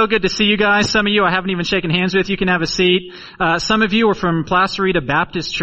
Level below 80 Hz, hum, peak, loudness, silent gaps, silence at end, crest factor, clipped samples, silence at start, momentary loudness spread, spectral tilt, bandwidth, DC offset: -40 dBFS; none; 0 dBFS; -16 LUFS; none; 0 s; 16 dB; under 0.1%; 0 s; 5 LU; -4.5 dB/octave; 8.4 kHz; under 0.1%